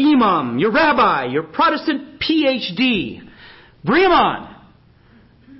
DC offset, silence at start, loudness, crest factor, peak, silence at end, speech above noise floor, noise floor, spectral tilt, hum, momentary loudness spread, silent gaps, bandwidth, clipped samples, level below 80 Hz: under 0.1%; 0 s; -16 LUFS; 14 dB; -4 dBFS; 1.05 s; 33 dB; -50 dBFS; -9.5 dB/octave; none; 10 LU; none; 5.8 kHz; under 0.1%; -48 dBFS